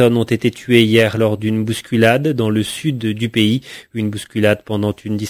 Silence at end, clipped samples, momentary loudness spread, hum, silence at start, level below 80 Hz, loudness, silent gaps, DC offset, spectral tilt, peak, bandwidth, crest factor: 0 s; under 0.1%; 9 LU; none; 0 s; -48 dBFS; -16 LUFS; none; under 0.1%; -6 dB/octave; 0 dBFS; 16 kHz; 16 dB